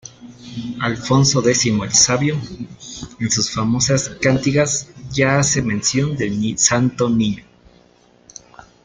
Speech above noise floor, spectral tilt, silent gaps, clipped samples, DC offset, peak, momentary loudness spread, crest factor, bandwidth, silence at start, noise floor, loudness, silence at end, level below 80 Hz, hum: 34 dB; -3.5 dB/octave; none; under 0.1%; under 0.1%; 0 dBFS; 17 LU; 18 dB; 10 kHz; 0.05 s; -52 dBFS; -17 LUFS; 1.45 s; -46 dBFS; none